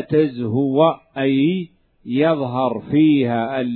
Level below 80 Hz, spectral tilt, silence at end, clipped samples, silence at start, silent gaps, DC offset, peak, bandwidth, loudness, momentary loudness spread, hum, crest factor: -60 dBFS; -11 dB/octave; 0 s; under 0.1%; 0 s; none; under 0.1%; -2 dBFS; 4.5 kHz; -18 LUFS; 7 LU; none; 16 dB